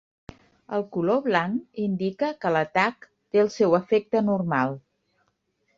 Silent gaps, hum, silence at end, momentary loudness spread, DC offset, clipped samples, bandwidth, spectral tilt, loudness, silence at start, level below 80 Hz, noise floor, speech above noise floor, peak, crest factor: none; none; 1 s; 8 LU; under 0.1%; under 0.1%; 7.6 kHz; -7 dB/octave; -24 LUFS; 0.7 s; -64 dBFS; -72 dBFS; 48 dB; -6 dBFS; 20 dB